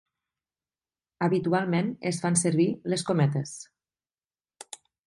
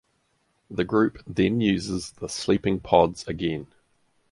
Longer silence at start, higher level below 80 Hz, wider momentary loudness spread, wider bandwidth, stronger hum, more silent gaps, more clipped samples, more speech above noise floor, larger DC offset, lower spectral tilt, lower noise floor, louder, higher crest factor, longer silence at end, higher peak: first, 1.2 s vs 0.7 s; second, -70 dBFS vs -50 dBFS; first, 19 LU vs 11 LU; about the same, 11.5 kHz vs 11.5 kHz; neither; neither; neither; first, over 64 dB vs 46 dB; neither; about the same, -5.5 dB/octave vs -5.5 dB/octave; first, under -90 dBFS vs -70 dBFS; about the same, -26 LUFS vs -25 LUFS; about the same, 20 dB vs 22 dB; first, 1.4 s vs 0.65 s; second, -10 dBFS vs -4 dBFS